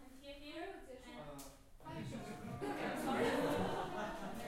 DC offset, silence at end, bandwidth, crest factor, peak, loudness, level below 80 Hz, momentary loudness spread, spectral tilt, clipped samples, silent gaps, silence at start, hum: under 0.1%; 0 s; 16 kHz; 18 dB; -24 dBFS; -42 LUFS; -60 dBFS; 17 LU; -5 dB/octave; under 0.1%; none; 0 s; none